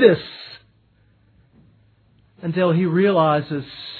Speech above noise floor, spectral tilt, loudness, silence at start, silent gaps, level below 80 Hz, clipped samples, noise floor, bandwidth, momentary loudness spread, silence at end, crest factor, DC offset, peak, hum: 40 dB; -10 dB/octave; -19 LUFS; 0 s; none; -62 dBFS; under 0.1%; -58 dBFS; 4.6 kHz; 19 LU; 0 s; 20 dB; under 0.1%; 0 dBFS; none